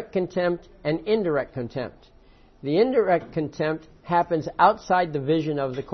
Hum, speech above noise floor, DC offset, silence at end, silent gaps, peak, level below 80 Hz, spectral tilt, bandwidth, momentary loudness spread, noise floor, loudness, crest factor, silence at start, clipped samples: none; 29 dB; under 0.1%; 0 s; none; -4 dBFS; -54 dBFS; -7.5 dB/octave; 6.4 kHz; 11 LU; -53 dBFS; -24 LUFS; 20 dB; 0 s; under 0.1%